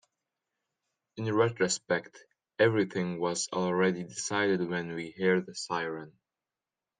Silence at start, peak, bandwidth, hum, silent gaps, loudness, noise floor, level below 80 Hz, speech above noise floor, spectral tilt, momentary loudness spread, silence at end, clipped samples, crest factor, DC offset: 1.15 s; -12 dBFS; 9.8 kHz; none; none; -30 LUFS; under -90 dBFS; -76 dBFS; over 60 dB; -4.5 dB/octave; 11 LU; 0.9 s; under 0.1%; 20 dB; under 0.1%